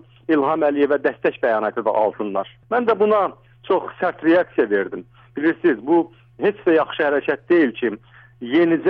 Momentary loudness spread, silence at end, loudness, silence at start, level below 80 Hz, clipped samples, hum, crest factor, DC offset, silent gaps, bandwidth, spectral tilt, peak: 8 LU; 0 s; -20 LUFS; 0.3 s; -62 dBFS; under 0.1%; none; 12 dB; under 0.1%; none; 4.8 kHz; -8.5 dB/octave; -6 dBFS